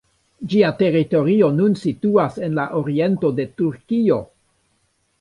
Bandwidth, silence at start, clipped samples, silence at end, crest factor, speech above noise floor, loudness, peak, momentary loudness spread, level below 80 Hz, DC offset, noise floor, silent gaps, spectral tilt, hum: 10.5 kHz; 0.4 s; under 0.1%; 0.95 s; 16 dB; 48 dB; -19 LUFS; -2 dBFS; 7 LU; -58 dBFS; under 0.1%; -66 dBFS; none; -8.5 dB/octave; none